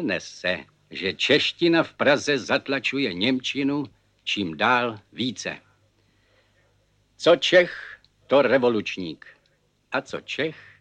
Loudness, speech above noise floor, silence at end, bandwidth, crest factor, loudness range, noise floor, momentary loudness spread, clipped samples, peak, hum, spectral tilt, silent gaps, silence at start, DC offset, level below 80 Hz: -23 LUFS; 43 dB; 0.25 s; 9.2 kHz; 20 dB; 4 LU; -66 dBFS; 14 LU; under 0.1%; -4 dBFS; 50 Hz at -65 dBFS; -4 dB/octave; none; 0 s; under 0.1%; -66 dBFS